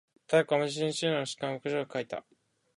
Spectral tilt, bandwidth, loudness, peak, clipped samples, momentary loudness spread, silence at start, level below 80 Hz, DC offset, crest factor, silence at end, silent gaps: -4.5 dB/octave; 11.5 kHz; -31 LUFS; -12 dBFS; under 0.1%; 10 LU; 0.3 s; -76 dBFS; under 0.1%; 20 dB; 0.55 s; none